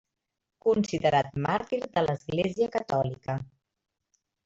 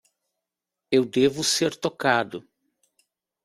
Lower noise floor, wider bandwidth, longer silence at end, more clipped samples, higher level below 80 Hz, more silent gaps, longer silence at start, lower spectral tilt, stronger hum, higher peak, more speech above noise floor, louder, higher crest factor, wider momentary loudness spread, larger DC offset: about the same, -85 dBFS vs -86 dBFS; second, 7.8 kHz vs 15.5 kHz; about the same, 1 s vs 1.05 s; neither; first, -60 dBFS vs -66 dBFS; neither; second, 0.65 s vs 0.9 s; first, -6.5 dB/octave vs -3.5 dB/octave; neither; second, -12 dBFS vs -4 dBFS; second, 58 dB vs 63 dB; second, -28 LUFS vs -23 LUFS; about the same, 18 dB vs 22 dB; about the same, 9 LU vs 8 LU; neither